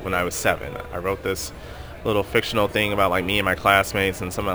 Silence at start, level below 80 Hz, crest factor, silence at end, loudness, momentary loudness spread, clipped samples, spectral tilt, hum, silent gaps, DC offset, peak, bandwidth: 0 s; -40 dBFS; 22 dB; 0 s; -22 LUFS; 12 LU; under 0.1%; -4 dB/octave; none; none; 0.2%; -2 dBFS; over 20 kHz